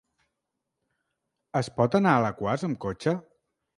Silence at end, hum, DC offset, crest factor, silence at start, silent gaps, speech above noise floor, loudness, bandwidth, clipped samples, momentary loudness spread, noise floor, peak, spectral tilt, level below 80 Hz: 0.55 s; none; under 0.1%; 22 dB; 1.55 s; none; 58 dB; -26 LUFS; 11.5 kHz; under 0.1%; 10 LU; -83 dBFS; -6 dBFS; -7 dB/octave; -60 dBFS